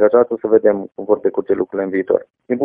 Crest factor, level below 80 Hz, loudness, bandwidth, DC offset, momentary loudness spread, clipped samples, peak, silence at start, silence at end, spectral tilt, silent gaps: 16 dB; -58 dBFS; -17 LUFS; 3.6 kHz; under 0.1%; 6 LU; under 0.1%; 0 dBFS; 0 s; 0 s; -12 dB/octave; none